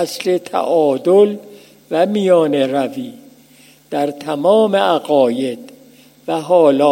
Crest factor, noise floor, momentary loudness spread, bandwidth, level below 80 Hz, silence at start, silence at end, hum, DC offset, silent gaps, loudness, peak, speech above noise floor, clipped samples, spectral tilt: 16 dB; -47 dBFS; 12 LU; 16.5 kHz; -70 dBFS; 0 s; 0 s; none; under 0.1%; none; -15 LUFS; 0 dBFS; 33 dB; under 0.1%; -5.5 dB/octave